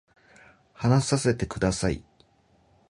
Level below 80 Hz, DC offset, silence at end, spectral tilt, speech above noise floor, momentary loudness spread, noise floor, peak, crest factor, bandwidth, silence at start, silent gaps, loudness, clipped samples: -46 dBFS; under 0.1%; 0.9 s; -5.5 dB/octave; 39 dB; 7 LU; -63 dBFS; -6 dBFS; 20 dB; 11.5 kHz; 0.8 s; none; -26 LUFS; under 0.1%